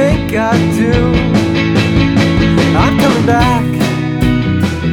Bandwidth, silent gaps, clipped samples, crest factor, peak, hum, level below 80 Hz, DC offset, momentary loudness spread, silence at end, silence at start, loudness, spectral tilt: 18 kHz; none; under 0.1%; 10 dB; 0 dBFS; none; -24 dBFS; under 0.1%; 4 LU; 0 s; 0 s; -12 LUFS; -6.5 dB/octave